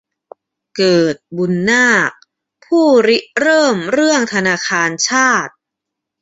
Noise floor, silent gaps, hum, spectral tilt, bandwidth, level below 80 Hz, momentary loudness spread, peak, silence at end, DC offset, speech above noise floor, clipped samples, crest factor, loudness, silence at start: -80 dBFS; none; none; -3.5 dB/octave; 8 kHz; -58 dBFS; 8 LU; -2 dBFS; 0.7 s; under 0.1%; 67 dB; under 0.1%; 14 dB; -13 LUFS; 0.75 s